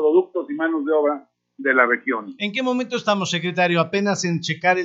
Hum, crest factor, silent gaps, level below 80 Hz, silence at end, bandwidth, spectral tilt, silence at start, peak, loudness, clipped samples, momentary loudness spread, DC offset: none; 18 dB; none; -76 dBFS; 0 s; 8 kHz; -4.5 dB/octave; 0 s; -2 dBFS; -21 LUFS; under 0.1%; 8 LU; under 0.1%